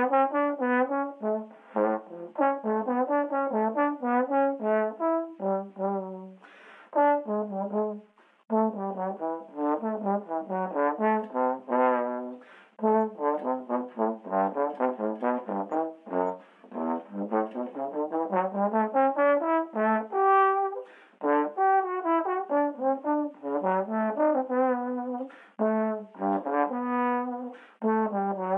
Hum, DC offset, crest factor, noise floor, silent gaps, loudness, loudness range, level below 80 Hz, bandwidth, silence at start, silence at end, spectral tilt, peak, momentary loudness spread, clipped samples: none; under 0.1%; 16 dB; -51 dBFS; none; -28 LUFS; 5 LU; under -90 dBFS; 3.8 kHz; 0 s; 0 s; -9.5 dB/octave; -12 dBFS; 9 LU; under 0.1%